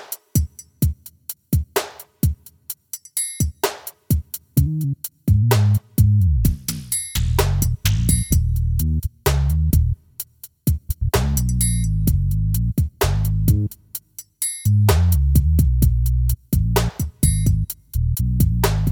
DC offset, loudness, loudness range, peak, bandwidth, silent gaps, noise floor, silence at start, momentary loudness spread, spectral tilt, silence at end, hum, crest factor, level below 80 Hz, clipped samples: under 0.1%; -20 LUFS; 6 LU; -2 dBFS; 18 kHz; none; -38 dBFS; 0 s; 11 LU; -5.5 dB/octave; 0 s; none; 18 dB; -24 dBFS; under 0.1%